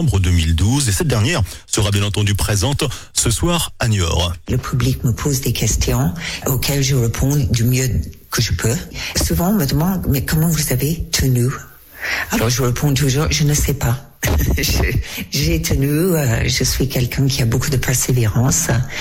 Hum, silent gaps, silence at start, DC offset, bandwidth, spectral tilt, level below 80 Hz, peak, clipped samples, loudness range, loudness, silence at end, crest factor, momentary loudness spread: none; none; 0 s; under 0.1%; 16.5 kHz; -4.5 dB/octave; -26 dBFS; -6 dBFS; under 0.1%; 1 LU; -17 LUFS; 0 s; 10 dB; 5 LU